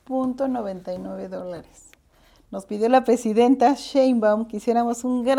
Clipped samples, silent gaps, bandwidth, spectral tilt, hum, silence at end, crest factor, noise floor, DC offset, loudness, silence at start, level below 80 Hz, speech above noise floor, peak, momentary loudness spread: under 0.1%; none; 13.5 kHz; -5.5 dB/octave; none; 0 s; 16 dB; -57 dBFS; under 0.1%; -22 LUFS; 0.1 s; -58 dBFS; 35 dB; -6 dBFS; 15 LU